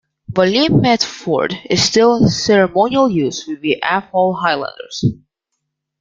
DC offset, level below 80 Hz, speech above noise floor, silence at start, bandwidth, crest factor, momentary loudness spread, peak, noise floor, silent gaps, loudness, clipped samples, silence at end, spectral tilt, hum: under 0.1%; -48 dBFS; 60 dB; 0.3 s; 9.4 kHz; 16 dB; 9 LU; 0 dBFS; -75 dBFS; none; -15 LUFS; under 0.1%; 0.85 s; -5 dB/octave; none